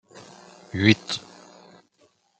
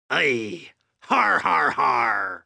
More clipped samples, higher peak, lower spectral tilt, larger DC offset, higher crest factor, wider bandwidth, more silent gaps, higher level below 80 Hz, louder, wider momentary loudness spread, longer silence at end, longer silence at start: neither; first, -2 dBFS vs -6 dBFS; first, -5 dB/octave vs -3.5 dB/octave; neither; first, 26 dB vs 18 dB; second, 9 kHz vs 11 kHz; neither; first, -64 dBFS vs -70 dBFS; about the same, -23 LUFS vs -21 LUFS; first, 27 LU vs 10 LU; first, 1.2 s vs 0.05 s; first, 0.75 s vs 0.1 s